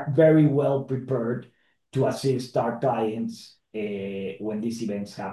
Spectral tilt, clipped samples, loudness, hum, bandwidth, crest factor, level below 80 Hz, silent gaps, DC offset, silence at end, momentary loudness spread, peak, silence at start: -7.5 dB/octave; under 0.1%; -25 LUFS; none; 12.5 kHz; 18 dB; -66 dBFS; none; under 0.1%; 0 s; 14 LU; -8 dBFS; 0 s